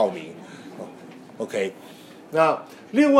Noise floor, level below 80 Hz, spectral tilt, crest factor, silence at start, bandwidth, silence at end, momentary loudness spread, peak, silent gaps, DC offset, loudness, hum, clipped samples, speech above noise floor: -43 dBFS; -78 dBFS; -5.5 dB/octave; 22 dB; 0 s; 14 kHz; 0 s; 23 LU; -2 dBFS; none; under 0.1%; -25 LUFS; none; under 0.1%; 21 dB